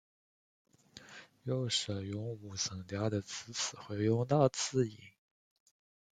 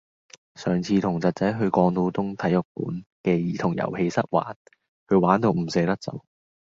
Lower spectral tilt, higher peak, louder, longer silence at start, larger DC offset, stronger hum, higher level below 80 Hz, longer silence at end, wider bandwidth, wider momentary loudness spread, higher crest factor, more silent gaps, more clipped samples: second, -4.5 dB/octave vs -7.5 dB/octave; second, -14 dBFS vs -2 dBFS; second, -35 LUFS vs -24 LUFS; first, 0.95 s vs 0.6 s; neither; neither; second, -70 dBFS vs -56 dBFS; first, 1 s vs 0.5 s; first, 9.6 kHz vs 7.6 kHz; first, 16 LU vs 11 LU; about the same, 22 dB vs 22 dB; second, none vs 2.65-2.75 s, 3.06-3.24 s, 4.56-4.65 s, 4.88-5.06 s; neither